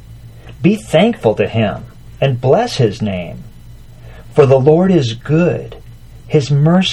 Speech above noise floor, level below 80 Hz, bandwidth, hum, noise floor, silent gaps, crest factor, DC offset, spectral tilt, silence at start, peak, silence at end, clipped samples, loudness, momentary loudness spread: 23 dB; -40 dBFS; 12 kHz; none; -36 dBFS; none; 14 dB; under 0.1%; -7 dB/octave; 0.1 s; 0 dBFS; 0 s; under 0.1%; -14 LUFS; 13 LU